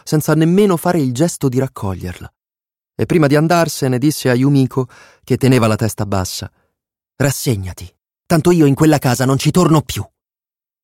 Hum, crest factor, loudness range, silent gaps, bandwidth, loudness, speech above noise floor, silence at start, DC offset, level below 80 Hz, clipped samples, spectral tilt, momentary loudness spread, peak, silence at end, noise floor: none; 14 dB; 3 LU; none; 16.5 kHz; -15 LUFS; over 76 dB; 0.05 s; under 0.1%; -44 dBFS; under 0.1%; -6 dB/octave; 15 LU; -2 dBFS; 0.8 s; under -90 dBFS